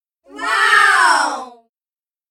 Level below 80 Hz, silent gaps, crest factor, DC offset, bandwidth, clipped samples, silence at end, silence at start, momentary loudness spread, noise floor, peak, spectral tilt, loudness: -66 dBFS; none; 16 dB; under 0.1%; 16.5 kHz; under 0.1%; 0.8 s; 0.35 s; 15 LU; under -90 dBFS; 0 dBFS; 1.5 dB/octave; -13 LUFS